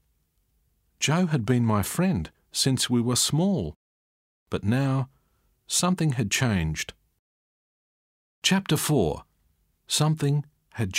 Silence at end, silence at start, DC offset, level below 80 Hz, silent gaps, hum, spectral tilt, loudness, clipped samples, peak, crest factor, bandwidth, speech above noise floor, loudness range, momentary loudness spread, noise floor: 0 s; 1 s; under 0.1%; -50 dBFS; 3.76-4.46 s, 7.19-8.42 s; none; -4.5 dB/octave; -25 LUFS; under 0.1%; -8 dBFS; 18 dB; 16 kHz; 46 dB; 4 LU; 10 LU; -70 dBFS